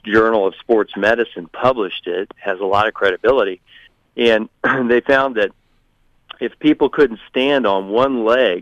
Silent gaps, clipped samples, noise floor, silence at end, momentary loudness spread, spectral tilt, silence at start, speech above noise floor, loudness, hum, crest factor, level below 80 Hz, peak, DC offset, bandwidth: none; under 0.1%; -58 dBFS; 0 s; 9 LU; -6 dB/octave; 0.05 s; 42 dB; -17 LUFS; none; 14 dB; -50 dBFS; -4 dBFS; under 0.1%; 8.2 kHz